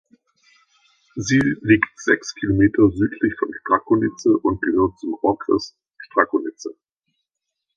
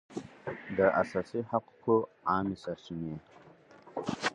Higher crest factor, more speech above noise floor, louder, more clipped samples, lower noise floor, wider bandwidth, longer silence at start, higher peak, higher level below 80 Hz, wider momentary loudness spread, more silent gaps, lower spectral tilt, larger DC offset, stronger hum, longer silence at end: about the same, 20 dB vs 22 dB; first, 61 dB vs 24 dB; first, -20 LUFS vs -32 LUFS; neither; first, -80 dBFS vs -56 dBFS; second, 7.6 kHz vs 10.5 kHz; first, 1.15 s vs 0.1 s; first, 0 dBFS vs -12 dBFS; first, -46 dBFS vs -64 dBFS; second, 10 LU vs 15 LU; neither; about the same, -6 dB/octave vs -6 dB/octave; neither; neither; first, 1.05 s vs 0 s